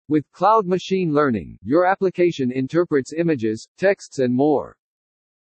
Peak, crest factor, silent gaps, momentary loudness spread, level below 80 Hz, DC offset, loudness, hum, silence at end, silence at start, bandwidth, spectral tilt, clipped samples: -4 dBFS; 16 dB; 3.68-3.75 s; 6 LU; -58 dBFS; under 0.1%; -20 LUFS; none; 0.75 s; 0.1 s; 8.6 kHz; -7 dB/octave; under 0.1%